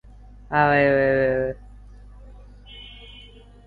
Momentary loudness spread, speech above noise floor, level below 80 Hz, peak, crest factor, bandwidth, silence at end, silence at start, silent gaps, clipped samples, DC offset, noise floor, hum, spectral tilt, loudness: 25 LU; 27 dB; -44 dBFS; -6 dBFS; 18 dB; 4.8 kHz; 0.5 s; 0.5 s; none; under 0.1%; under 0.1%; -46 dBFS; 50 Hz at -45 dBFS; -8.5 dB/octave; -20 LUFS